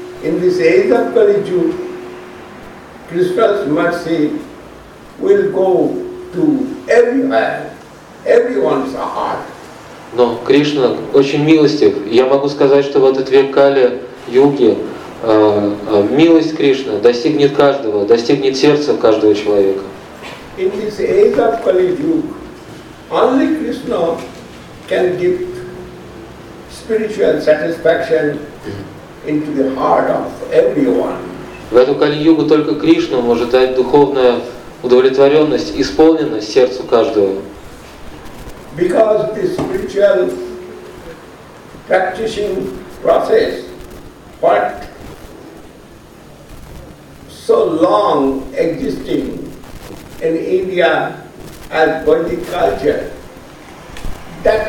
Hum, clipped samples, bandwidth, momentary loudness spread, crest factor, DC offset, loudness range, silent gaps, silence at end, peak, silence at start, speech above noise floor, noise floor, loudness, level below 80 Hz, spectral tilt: none; under 0.1%; 16 kHz; 22 LU; 14 dB; under 0.1%; 6 LU; none; 0 s; 0 dBFS; 0 s; 26 dB; -38 dBFS; -13 LUFS; -42 dBFS; -6 dB/octave